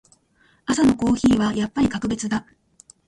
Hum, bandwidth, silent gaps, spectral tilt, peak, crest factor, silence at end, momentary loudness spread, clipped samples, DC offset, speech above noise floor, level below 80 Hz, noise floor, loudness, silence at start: none; 11.5 kHz; none; -5 dB/octave; -8 dBFS; 14 dB; 0.65 s; 9 LU; under 0.1%; under 0.1%; 41 dB; -46 dBFS; -60 dBFS; -21 LUFS; 0.7 s